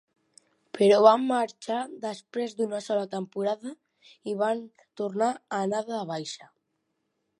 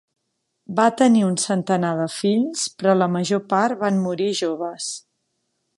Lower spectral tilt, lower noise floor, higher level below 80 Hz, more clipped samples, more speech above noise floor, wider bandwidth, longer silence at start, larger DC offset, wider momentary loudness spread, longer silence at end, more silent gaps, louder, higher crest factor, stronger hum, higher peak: about the same, -5 dB/octave vs -5 dB/octave; about the same, -78 dBFS vs -75 dBFS; second, -84 dBFS vs -70 dBFS; neither; second, 51 dB vs 55 dB; about the same, 11 kHz vs 11.5 kHz; about the same, 0.75 s vs 0.7 s; neither; first, 17 LU vs 10 LU; first, 1.05 s vs 0.8 s; neither; second, -27 LUFS vs -21 LUFS; first, 24 dB vs 18 dB; neither; about the same, -4 dBFS vs -4 dBFS